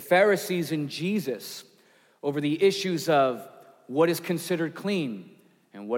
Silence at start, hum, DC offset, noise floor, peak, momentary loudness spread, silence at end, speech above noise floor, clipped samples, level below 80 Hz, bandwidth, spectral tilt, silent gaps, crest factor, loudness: 0 s; none; under 0.1%; -61 dBFS; -10 dBFS; 14 LU; 0 s; 35 dB; under 0.1%; -82 dBFS; 17 kHz; -5 dB/octave; none; 18 dB; -26 LUFS